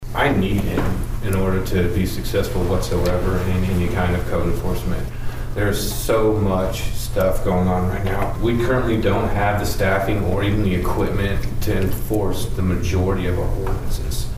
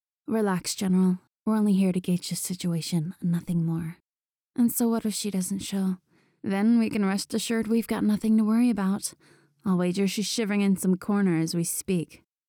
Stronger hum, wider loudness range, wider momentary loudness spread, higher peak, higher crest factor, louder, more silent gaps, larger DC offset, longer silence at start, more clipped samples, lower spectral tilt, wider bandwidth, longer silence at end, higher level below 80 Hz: neither; about the same, 2 LU vs 3 LU; about the same, 6 LU vs 8 LU; first, -6 dBFS vs -14 dBFS; about the same, 12 dB vs 10 dB; first, -21 LUFS vs -26 LUFS; second, none vs 4.09-4.13 s; neither; second, 0 s vs 0.3 s; neither; about the same, -6 dB/octave vs -5.5 dB/octave; second, 16 kHz vs 19.5 kHz; second, 0 s vs 0.3 s; first, -26 dBFS vs -64 dBFS